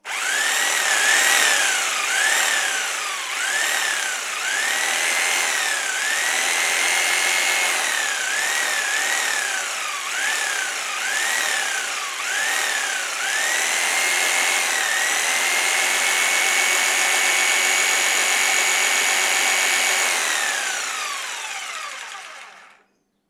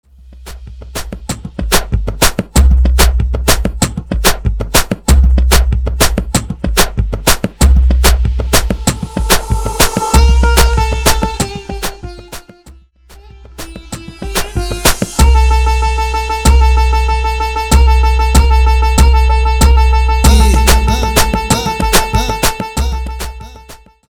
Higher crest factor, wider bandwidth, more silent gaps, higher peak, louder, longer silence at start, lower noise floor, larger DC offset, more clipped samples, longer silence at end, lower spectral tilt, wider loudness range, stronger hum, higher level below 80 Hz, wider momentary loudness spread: first, 18 dB vs 12 dB; about the same, over 20 kHz vs over 20 kHz; neither; about the same, -2 dBFS vs 0 dBFS; second, -19 LUFS vs -12 LUFS; second, 0.05 s vs 0.3 s; first, -64 dBFS vs -40 dBFS; second, under 0.1% vs 2%; neither; first, 0.65 s vs 0.35 s; second, 3.5 dB/octave vs -4 dB/octave; about the same, 5 LU vs 6 LU; neither; second, -84 dBFS vs -12 dBFS; second, 7 LU vs 15 LU